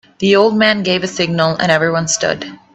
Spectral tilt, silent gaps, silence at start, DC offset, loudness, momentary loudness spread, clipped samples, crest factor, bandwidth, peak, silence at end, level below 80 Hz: -4 dB/octave; none; 0.2 s; under 0.1%; -14 LUFS; 6 LU; under 0.1%; 14 dB; 8.6 kHz; 0 dBFS; 0.2 s; -52 dBFS